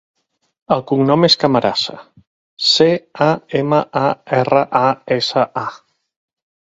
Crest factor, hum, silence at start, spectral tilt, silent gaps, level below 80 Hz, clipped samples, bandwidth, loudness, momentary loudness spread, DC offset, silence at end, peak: 16 dB; none; 0.7 s; -5 dB/octave; 2.27-2.57 s; -58 dBFS; under 0.1%; 8 kHz; -15 LUFS; 8 LU; under 0.1%; 0.9 s; 0 dBFS